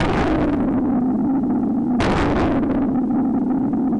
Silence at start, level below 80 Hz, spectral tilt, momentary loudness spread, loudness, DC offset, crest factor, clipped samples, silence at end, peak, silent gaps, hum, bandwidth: 0 s; -34 dBFS; -7.5 dB/octave; 2 LU; -19 LUFS; under 0.1%; 8 dB; under 0.1%; 0 s; -12 dBFS; none; none; 9.8 kHz